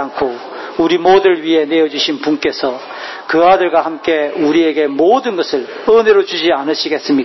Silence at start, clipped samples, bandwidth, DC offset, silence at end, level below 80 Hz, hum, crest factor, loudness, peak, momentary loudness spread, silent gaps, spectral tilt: 0 s; under 0.1%; 6.2 kHz; under 0.1%; 0 s; -52 dBFS; none; 12 dB; -13 LUFS; 0 dBFS; 10 LU; none; -4.5 dB/octave